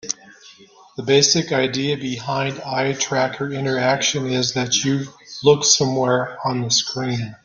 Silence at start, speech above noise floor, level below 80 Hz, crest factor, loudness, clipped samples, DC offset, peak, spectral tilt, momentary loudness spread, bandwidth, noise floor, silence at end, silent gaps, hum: 0.05 s; 28 dB; -58 dBFS; 18 dB; -19 LUFS; under 0.1%; under 0.1%; -2 dBFS; -3 dB/octave; 10 LU; 10.5 kHz; -47 dBFS; 0.1 s; none; none